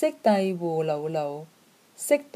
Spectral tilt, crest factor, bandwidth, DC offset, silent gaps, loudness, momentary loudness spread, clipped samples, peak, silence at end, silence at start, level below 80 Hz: -5.5 dB/octave; 18 dB; 15.5 kHz; under 0.1%; none; -26 LUFS; 12 LU; under 0.1%; -8 dBFS; 0.15 s; 0 s; -78 dBFS